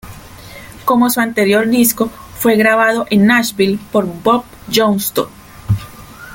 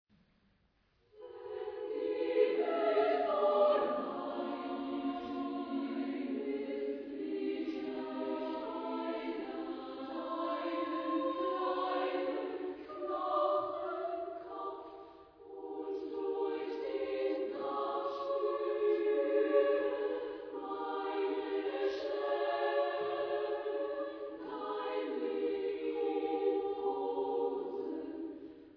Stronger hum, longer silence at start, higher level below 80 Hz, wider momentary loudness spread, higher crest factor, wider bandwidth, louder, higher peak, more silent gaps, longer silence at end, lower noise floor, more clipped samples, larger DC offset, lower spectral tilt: neither; second, 0.05 s vs 1.15 s; first, -42 dBFS vs -76 dBFS; first, 23 LU vs 12 LU; about the same, 14 dB vs 18 dB; first, 17 kHz vs 5.4 kHz; first, -14 LUFS vs -36 LUFS; first, 0 dBFS vs -18 dBFS; neither; about the same, 0 s vs 0 s; second, -34 dBFS vs -73 dBFS; neither; neither; first, -4.5 dB/octave vs -2 dB/octave